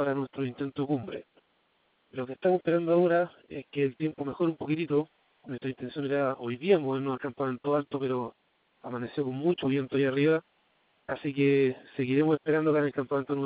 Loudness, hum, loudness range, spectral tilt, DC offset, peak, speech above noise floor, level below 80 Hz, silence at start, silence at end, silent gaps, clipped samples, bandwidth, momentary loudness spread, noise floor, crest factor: -29 LUFS; none; 3 LU; -11 dB/octave; under 0.1%; -10 dBFS; 42 dB; -70 dBFS; 0 s; 0 s; none; under 0.1%; 4 kHz; 13 LU; -71 dBFS; 18 dB